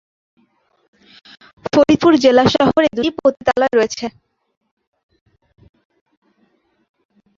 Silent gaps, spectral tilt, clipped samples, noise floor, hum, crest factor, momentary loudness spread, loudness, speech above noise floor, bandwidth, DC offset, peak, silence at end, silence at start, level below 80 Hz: none; -5 dB/octave; under 0.1%; -61 dBFS; none; 18 dB; 12 LU; -14 LUFS; 48 dB; 7.6 kHz; under 0.1%; -2 dBFS; 3.3 s; 1.65 s; -50 dBFS